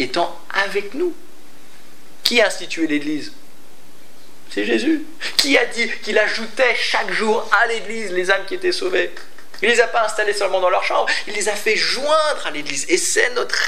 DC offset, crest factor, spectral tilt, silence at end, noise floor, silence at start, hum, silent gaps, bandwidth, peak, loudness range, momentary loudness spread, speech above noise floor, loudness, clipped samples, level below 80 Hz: 5%; 20 dB; -1.5 dB/octave; 0 s; -48 dBFS; 0 s; none; none; 16 kHz; 0 dBFS; 5 LU; 9 LU; 29 dB; -18 LUFS; under 0.1%; -70 dBFS